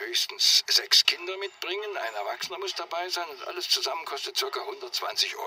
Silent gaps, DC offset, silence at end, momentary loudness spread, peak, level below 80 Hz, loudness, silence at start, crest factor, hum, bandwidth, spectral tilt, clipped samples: none; under 0.1%; 0 s; 13 LU; -4 dBFS; -86 dBFS; -26 LUFS; 0 s; 24 dB; none; 16 kHz; 2 dB/octave; under 0.1%